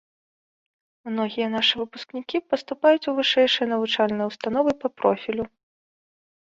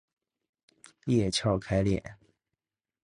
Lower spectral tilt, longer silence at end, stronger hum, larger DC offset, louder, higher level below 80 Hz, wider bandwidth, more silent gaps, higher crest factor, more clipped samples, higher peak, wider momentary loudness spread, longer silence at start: about the same, -4.5 dB/octave vs -5.5 dB/octave; about the same, 1 s vs 0.9 s; neither; neither; first, -23 LUFS vs -28 LUFS; second, -64 dBFS vs -50 dBFS; second, 7.8 kHz vs 11 kHz; neither; about the same, 20 dB vs 18 dB; neither; first, -6 dBFS vs -14 dBFS; about the same, 12 LU vs 12 LU; about the same, 1.05 s vs 1.05 s